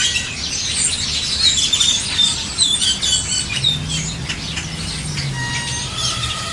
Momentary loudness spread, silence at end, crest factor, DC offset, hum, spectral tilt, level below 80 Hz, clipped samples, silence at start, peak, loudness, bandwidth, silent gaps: 10 LU; 0 s; 18 dB; under 0.1%; none; -1 dB/octave; -36 dBFS; under 0.1%; 0 s; -2 dBFS; -17 LUFS; 11.5 kHz; none